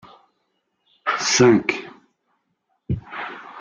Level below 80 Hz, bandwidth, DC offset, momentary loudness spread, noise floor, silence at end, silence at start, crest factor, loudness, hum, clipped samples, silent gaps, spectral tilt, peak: -50 dBFS; 9 kHz; under 0.1%; 18 LU; -72 dBFS; 0 s; 1.05 s; 20 dB; -20 LUFS; none; under 0.1%; none; -4 dB/octave; -2 dBFS